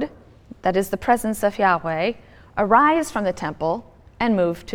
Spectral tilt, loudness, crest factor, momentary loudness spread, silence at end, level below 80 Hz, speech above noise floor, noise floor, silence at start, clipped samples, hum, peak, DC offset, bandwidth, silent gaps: -5.5 dB/octave; -21 LUFS; 20 dB; 10 LU; 0 s; -48 dBFS; 24 dB; -45 dBFS; 0 s; under 0.1%; none; -2 dBFS; under 0.1%; 18.5 kHz; none